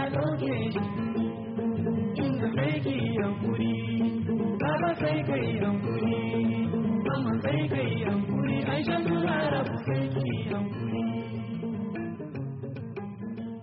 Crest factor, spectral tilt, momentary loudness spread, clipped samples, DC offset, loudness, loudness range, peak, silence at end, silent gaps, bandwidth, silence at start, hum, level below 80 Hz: 14 dB; -6.5 dB/octave; 8 LU; under 0.1%; under 0.1%; -29 LUFS; 4 LU; -14 dBFS; 0 s; none; 5.2 kHz; 0 s; none; -60 dBFS